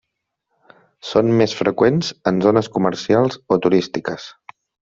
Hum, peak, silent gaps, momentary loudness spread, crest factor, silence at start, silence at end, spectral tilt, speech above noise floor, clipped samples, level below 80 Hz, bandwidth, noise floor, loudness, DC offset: none; 0 dBFS; none; 11 LU; 18 dB; 1.05 s; 0.65 s; -6.5 dB/octave; 60 dB; under 0.1%; -56 dBFS; 7.8 kHz; -77 dBFS; -18 LUFS; under 0.1%